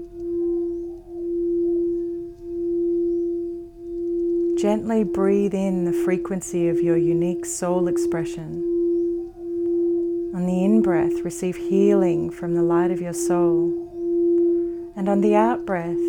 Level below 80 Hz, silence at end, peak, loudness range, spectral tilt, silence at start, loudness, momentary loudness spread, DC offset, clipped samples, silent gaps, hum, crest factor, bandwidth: -50 dBFS; 0 s; -6 dBFS; 4 LU; -7 dB/octave; 0 s; -22 LUFS; 10 LU; under 0.1%; under 0.1%; none; none; 16 dB; 12.5 kHz